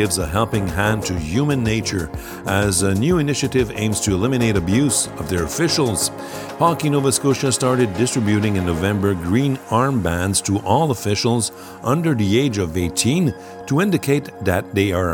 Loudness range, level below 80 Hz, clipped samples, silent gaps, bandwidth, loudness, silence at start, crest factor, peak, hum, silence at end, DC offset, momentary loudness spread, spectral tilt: 1 LU; -40 dBFS; under 0.1%; none; 19 kHz; -19 LUFS; 0 s; 16 dB; -2 dBFS; none; 0 s; under 0.1%; 5 LU; -5 dB/octave